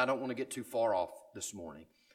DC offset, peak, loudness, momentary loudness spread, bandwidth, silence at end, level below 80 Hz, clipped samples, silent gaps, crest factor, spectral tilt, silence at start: under 0.1%; -16 dBFS; -36 LUFS; 16 LU; 16 kHz; 0.3 s; -74 dBFS; under 0.1%; none; 20 dB; -4 dB/octave; 0 s